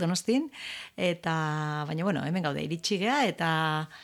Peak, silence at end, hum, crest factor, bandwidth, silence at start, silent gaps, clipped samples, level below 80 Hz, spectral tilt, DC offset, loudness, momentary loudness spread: -12 dBFS; 0 s; none; 16 dB; 14.5 kHz; 0 s; none; under 0.1%; -70 dBFS; -5 dB/octave; under 0.1%; -29 LUFS; 5 LU